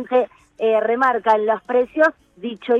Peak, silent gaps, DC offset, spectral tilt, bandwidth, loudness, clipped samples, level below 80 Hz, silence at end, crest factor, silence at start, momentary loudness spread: -4 dBFS; none; under 0.1%; -5.5 dB/octave; 7.6 kHz; -19 LUFS; under 0.1%; -64 dBFS; 0 s; 14 dB; 0 s; 13 LU